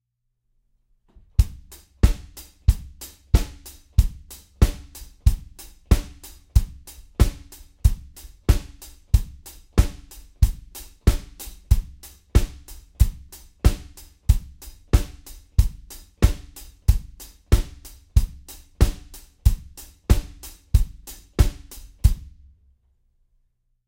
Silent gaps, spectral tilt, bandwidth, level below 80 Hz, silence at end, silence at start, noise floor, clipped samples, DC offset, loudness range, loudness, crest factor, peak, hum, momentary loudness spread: none; -6 dB/octave; 17 kHz; -24 dBFS; 1.65 s; 1.4 s; -74 dBFS; under 0.1%; under 0.1%; 1 LU; -25 LUFS; 22 dB; -2 dBFS; none; 20 LU